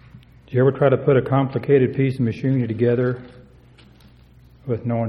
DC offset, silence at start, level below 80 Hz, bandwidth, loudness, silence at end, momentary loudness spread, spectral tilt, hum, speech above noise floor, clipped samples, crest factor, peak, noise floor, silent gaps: under 0.1%; 0.15 s; -52 dBFS; 5.4 kHz; -20 LUFS; 0 s; 10 LU; -10 dB/octave; none; 30 dB; under 0.1%; 18 dB; -2 dBFS; -49 dBFS; none